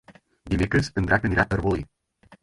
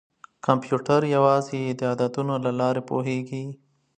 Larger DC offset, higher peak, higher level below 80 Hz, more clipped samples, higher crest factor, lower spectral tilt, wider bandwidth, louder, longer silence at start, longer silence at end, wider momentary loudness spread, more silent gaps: neither; about the same, -4 dBFS vs -2 dBFS; first, -38 dBFS vs -68 dBFS; neither; about the same, 20 dB vs 22 dB; about the same, -6.5 dB/octave vs -7 dB/octave; first, 11.5 kHz vs 9.4 kHz; about the same, -24 LUFS vs -24 LUFS; second, 0.1 s vs 0.45 s; second, 0.1 s vs 0.45 s; about the same, 8 LU vs 10 LU; neither